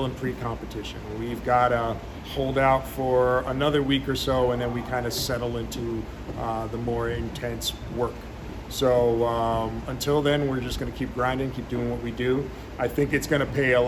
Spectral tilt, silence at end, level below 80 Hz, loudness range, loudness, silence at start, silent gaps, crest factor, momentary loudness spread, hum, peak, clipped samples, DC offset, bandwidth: -5.5 dB/octave; 0 s; -40 dBFS; 5 LU; -26 LUFS; 0 s; none; 18 dB; 11 LU; none; -8 dBFS; under 0.1%; under 0.1%; 19 kHz